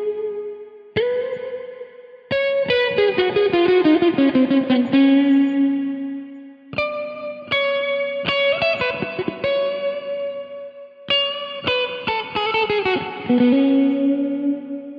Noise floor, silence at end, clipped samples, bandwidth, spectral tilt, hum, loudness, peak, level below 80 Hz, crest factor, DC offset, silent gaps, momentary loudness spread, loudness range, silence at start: -39 dBFS; 0 s; under 0.1%; 5.4 kHz; -7 dB/octave; none; -19 LUFS; -6 dBFS; -58 dBFS; 14 dB; under 0.1%; none; 16 LU; 6 LU; 0 s